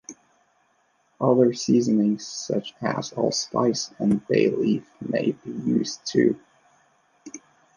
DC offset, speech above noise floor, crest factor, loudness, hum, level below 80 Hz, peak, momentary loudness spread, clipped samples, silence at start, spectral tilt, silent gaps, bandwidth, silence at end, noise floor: under 0.1%; 43 dB; 18 dB; -24 LUFS; none; -66 dBFS; -6 dBFS; 11 LU; under 0.1%; 0.1 s; -5.5 dB/octave; none; 10 kHz; 0.4 s; -66 dBFS